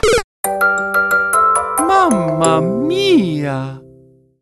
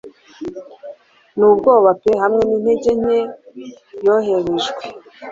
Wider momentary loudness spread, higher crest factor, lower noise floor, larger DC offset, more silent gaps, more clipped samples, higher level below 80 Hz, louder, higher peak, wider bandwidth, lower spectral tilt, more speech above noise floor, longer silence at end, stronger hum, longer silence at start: second, 8 LU vs 23 LU; about the same, 14 dB vs 16 dB; first, -47 dBFS vs -40 dBFS; neither; first, 0.24-0.43 s vs none; neither; first, -38 dBFS vs -52 dBFS; about the same, -14 LUFS vs -15 LUFS; about the same, 0 dBFS vs -2 dBFS; first, 13.5 kHz vs 7.6 kHz; about the same, -4.5 dB/octave vs -5.5 dB/octave; first, 32 dB vs 24 dB; first, 0.6 s vs 0 s; neither; about the same, 0.05 s vs 0.05 s